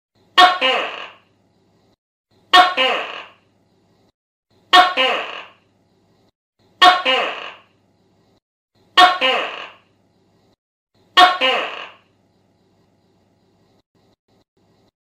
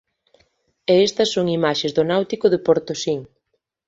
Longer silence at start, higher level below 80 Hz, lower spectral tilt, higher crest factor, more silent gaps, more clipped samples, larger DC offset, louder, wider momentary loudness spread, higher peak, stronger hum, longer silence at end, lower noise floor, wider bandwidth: second, 0.35 s vs 0.9 s; second, -68 dBFS vs -60 dBFS; second, -0.5 dB/octave vs -5 dB/octave; about the same, 20 dB vs 18 dB; first, 1.98-2.24 s, 4.14-4.43 s, 6.35-6.53 s, 8.42-8.68 s, 10.58-10.87 s vs none; first, 0.1% vs under 0.1%; neither; first, -14 LUFS vs -19 LUFS; first, 22 LU vs 8 LU; about the same, 0 dBFS vs -2 dBFS; neither; first, 3.15 s vs 0.65 s; second, -60 dBFS vs -73 dBFS; first, 15.5 kHz vs 8 kHz